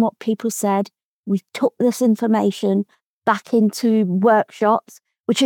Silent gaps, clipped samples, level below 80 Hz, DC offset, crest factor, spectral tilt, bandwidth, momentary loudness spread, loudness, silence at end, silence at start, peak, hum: 1.03-1.23 s, 3.03-3.21 s, 5.20-5.24 s; under 0.1%; -86 dBFS; under 0.1%; 16 dB; -5.5 dB/octave; 18 kHz; 8 LU; -19 LUFS; 0 s; 0 s; -4 dBFS; none